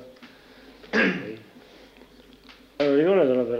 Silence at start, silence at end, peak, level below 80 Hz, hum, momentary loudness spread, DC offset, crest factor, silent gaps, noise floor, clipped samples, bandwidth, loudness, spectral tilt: 0 s; 0 s; -8 dBFS; -62 dBFS; none; 17 LU; under 0.1%; 16 dB; none; -51 dBFS; under 0.1%; 7.4 kHz; -22 LUFS; -6.5 dB/octave